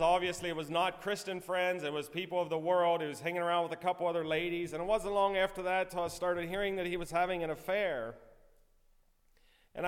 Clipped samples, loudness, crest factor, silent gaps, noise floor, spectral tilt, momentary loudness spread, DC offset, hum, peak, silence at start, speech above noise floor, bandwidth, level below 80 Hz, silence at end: under 0.1%; -34 LUFS; 18 dB; none; -67 dBFS; -4.5 dB/octave; 7 LU; under 0.1%; none; -16 dBFS; 0 s; 34 dB; 16.5 kHz; -58 dBFS; 0 s